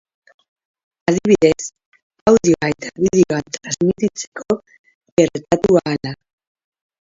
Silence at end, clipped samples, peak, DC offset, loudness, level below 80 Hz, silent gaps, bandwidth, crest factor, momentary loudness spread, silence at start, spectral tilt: 0.9 s; under 0.1%; 0 dBFS; under 0.1%; -17 LUFS; -48 dBFS; 1.86-1.92 s, 2.02-2.10 s, 2.21-2.26 s, 4.27-4.32 s, 4.79-4.84 s, 4.94-5.01 s, 5.12-5.17 s; 7.8 kHz; 18 dB; 11 LU; 1.1 s; -5.5 dB/octave